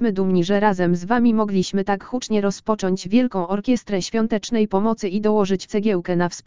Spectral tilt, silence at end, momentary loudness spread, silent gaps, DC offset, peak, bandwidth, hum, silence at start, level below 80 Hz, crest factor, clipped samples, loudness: -6 dB/octave; 0 s; 5 LU; none; 2%; -2 dBFS; 7.6 kHz; none; 0 s; -50 dBFS; 18 dB; under 0.1%; -21 LUFS